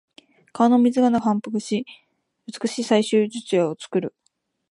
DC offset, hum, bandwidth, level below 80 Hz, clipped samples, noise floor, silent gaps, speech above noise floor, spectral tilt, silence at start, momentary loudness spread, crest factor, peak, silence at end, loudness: under 0.1%; none; 11.5 kHz; -68 dBFS; under 0.1%; -71 dBFS; none; 50 dB; -5.5 dB/octave; 0.55 s; 15 LU; 18 dB; -4 dBFS; 0.6 s; -21 LUFS